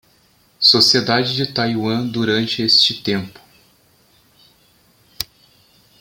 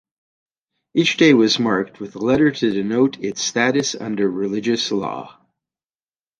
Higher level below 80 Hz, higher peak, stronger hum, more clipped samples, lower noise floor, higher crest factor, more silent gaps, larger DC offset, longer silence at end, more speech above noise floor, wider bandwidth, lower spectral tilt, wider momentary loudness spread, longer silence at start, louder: about the same, -56 dBFS vs -58 dBFS; about the same, 0 dBFS vs -2 dBFS; neither; neither; second, -56 dBFS vs under -90 dBFS; about the same, 20 dB vs 18 dB; neither; neither; second, 0.75 s vs 1.1 s; second, 38 dB vs over 72 dB; first, 17 kHz vs 10 kHz; about the same, -4 dB/octave vs -4 dB/octave; first, 18 LU vs 10 LU; second, 0.6 s vs 0.95 s; first, -15 LUFS vs -18 LUFS